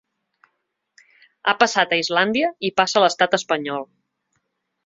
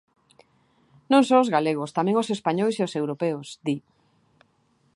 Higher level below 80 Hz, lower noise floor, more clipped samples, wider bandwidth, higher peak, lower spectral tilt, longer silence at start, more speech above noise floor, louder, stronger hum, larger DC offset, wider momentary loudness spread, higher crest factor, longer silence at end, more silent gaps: first, -68 dBFS vs -76 dBFS; first, -74 dBFS vs -66 dBFS; neither; second, 8 kHz vs 11.5 kHz; about the same, -2 dBFS vs -4 dBFS; second, -3 dB/octave vs -6 dB/octave; first, 1.45 s vs 1.1 s; first, 55 dB vs 43 dB; first, -19 LUFS vs -24 LUFS; neither; neither; about the same, 9 LU vs 11 LU; about the same, 22 dB vs 20 dB; second, 1 s vs 1.15 s; neither